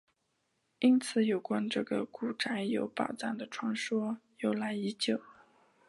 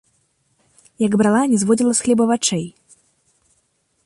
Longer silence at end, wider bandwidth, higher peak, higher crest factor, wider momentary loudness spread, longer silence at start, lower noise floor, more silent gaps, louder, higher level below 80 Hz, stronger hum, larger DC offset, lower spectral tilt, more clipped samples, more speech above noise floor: second, 0.55 s vs 1.35 s; about the same, 11.5 kHz vs 11.5 kHz; second, -16 dBFS vs -4 dBFS; about the same, 18 dB vs 16 dB; about the same, 9 LU vs 8 LU; second, 0.8 s vs 1 s; first, -79 dBFS vs -66 dBFS; neither; second, -33 LUFS vs -17 LUFS; second, -80 dBFS vs -60 dBFS; neither; neither; about the same, -5 dB/octave vs -4.5 dB/octave; neither; about the same, 47 dB vs 49 dB